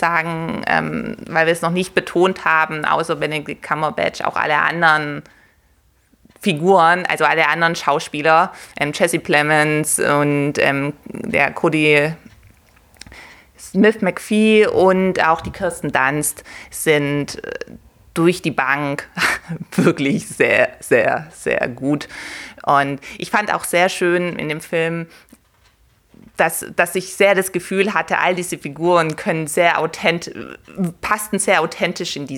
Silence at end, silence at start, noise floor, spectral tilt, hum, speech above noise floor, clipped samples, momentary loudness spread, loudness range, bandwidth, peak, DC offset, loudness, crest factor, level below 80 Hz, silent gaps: 0 s; 0 s; -57 dBFS; -4.5 dB/octave; none; 39 dB; under 0.1%; 11 LU; 4 LU; 19 kHz; -2 dBFS; under 0.1%; -17 LUFS; 18 dB; -52 dBFS; none